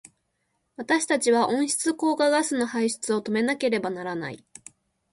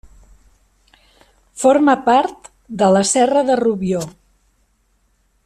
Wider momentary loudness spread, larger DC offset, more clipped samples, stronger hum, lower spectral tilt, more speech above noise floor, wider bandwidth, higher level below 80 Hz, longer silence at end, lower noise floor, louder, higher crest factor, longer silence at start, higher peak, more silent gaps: about the same, 11 LU vs 11 LU; neither; neither; neither; second, -3 dB/octave vs -4.5 dB/octave; about the same, 50 dB vs 47 dB; second, 12 kHz vs 13.5 kHz; second, -70 dBFS vs -52 dBFS; second, 0.75 s vs 1.35 s; first, -75 dBFS vs -61 dBFS; second, -24 LUFS vs -15 LUFS; about the same, 16 dB vs 16 dB; second, 0.8 s vs 1.55 s; second, -10 dBFS vs -2 dBFS; neither